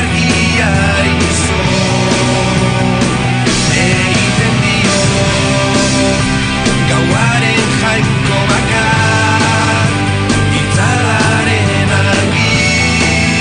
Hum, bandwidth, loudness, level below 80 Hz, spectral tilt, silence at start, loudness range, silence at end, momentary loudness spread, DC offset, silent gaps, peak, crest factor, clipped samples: none; 10 kHz; -11 LUFS; -28 dBFS; -4.5 dB/octave; 0 s; 1 LU; 0 s; 2 LU; under 0.1%; none; 0 dBFS; 10 dB; under 0.1%